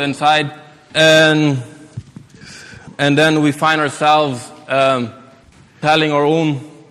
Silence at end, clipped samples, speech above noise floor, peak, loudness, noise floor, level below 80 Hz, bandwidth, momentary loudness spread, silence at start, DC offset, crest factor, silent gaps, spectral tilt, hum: 0.2 s; under 0.1%; 32 dB; 0 dBFS; -14 LUFS; -46 dBFS; -56 dBFS; 14 kHz; 24 LU; 0 s; under 0.1%; 16 dB; none; -5 dB/octave; none